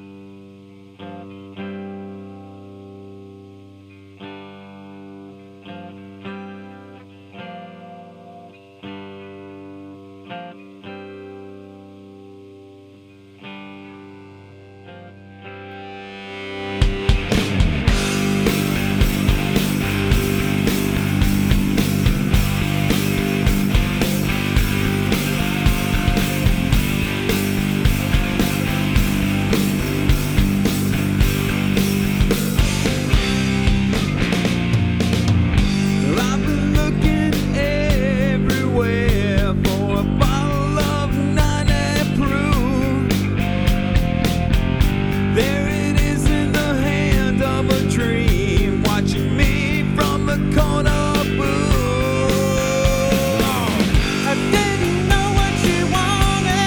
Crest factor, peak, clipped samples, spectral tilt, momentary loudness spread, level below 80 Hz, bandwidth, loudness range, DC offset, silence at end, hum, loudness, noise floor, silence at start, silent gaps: 16 dB; -4 dBFS; under 0.1%; -5.5 dB/octave; 20 LU; -26 dBFS; over 20 kHz; 19 LU; under 0.1%; 0 s; none; -18 LUFS; -45 dBFS; 0 s; none